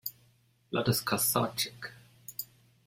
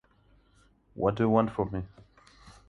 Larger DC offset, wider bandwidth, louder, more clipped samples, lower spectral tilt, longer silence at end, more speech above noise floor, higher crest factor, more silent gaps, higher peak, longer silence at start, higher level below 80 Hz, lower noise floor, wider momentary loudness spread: neither; first, 16.5 kHz vs 7 kHz; second, -31 LUFS vs -28 LUFS; neither; second, -3.5 dB/octave vs -9 dB/octave; first, 0.4 s vs 0.15 s; about the same, 36 dB vs 36 dB; about the same, 22 dB vs 22 dB; neither; about the same, -12 dBFS vs -10 dBFS; second, 0.05 s vs 0.95 s; second, -68 dBFS vs -54 dBFS; about the same, -66 dBFS vs -64 dBFS; first, 18 LU vs 13 LU